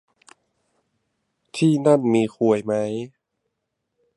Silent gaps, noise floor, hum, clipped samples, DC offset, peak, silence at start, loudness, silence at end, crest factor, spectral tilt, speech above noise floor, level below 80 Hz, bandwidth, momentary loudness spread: none; -78 dBFS; none; under 0.1%; under 0.1%; -2 dBFS; 1.55 s; -20 LUFS; 1.1 s; 20 dB; -7 dB/octave; 59 dB; -68 dBFS; 11.5 kHz; 15 LU